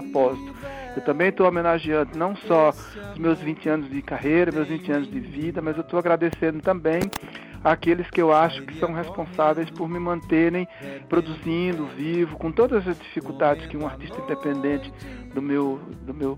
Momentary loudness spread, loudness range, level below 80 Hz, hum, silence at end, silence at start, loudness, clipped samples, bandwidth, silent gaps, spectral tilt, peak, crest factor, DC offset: 13 LU; 3 LU; -48 dBFS; none; 0 s; 0 s; -24 LUFS; under 0.1%; 16 kHz; none; -7 dB/octave; -4 dBFS; 18 dB; under 0.1%